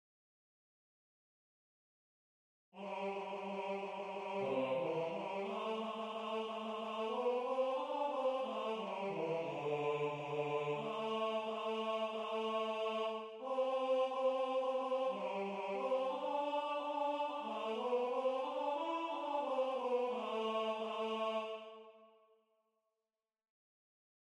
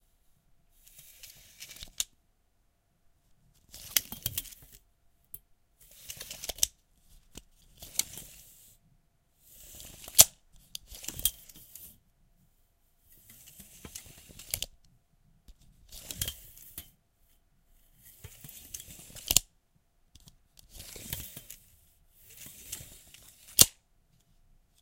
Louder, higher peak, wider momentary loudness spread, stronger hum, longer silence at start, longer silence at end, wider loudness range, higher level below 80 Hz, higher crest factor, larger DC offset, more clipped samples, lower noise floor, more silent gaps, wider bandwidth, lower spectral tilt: second, -39 LUFS vs -28 LUFS; second, -26 dBFS vs 0 dBFS; second, 5 LU vs 28 LU; neither; first, 2.75 s vs 1.25 s; first, 2.3 s vs 1.1 s; second, 7 LU vs 16 LU; second, -88 dBFS vs -56 dBFS; second, 14 dB vs 38 dB; neither; neither; first, under -90 dBFS vs -71 dBFS; neither; second, 10.5 kHz vs 17 kHz; first, -5.5 dB/octave vs 0 dB/octave